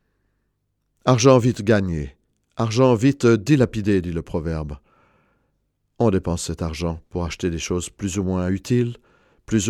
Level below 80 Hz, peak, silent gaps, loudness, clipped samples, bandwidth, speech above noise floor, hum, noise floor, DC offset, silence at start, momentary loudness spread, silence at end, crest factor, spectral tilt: -42 dBFS; 0 dBFS; none; -21 LUFS; under 0.1%; 13 kHz; 52 dB; 50 Hz at -45 dBFS; -72 dBFS; under 0.1%; 1.05 s; 12 LU; 0 s; 20 dB; -6 dB/octave